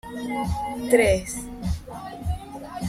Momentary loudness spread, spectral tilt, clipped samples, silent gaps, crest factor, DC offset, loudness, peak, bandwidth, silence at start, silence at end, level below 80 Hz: 15 LU; -5.5 dB/octave; under 0.1%; none; 20 dB; under 0.1%; -25 LUFS; -6 dBFS; 16 kHz; 0.05 s; 0 s; -38 dBFS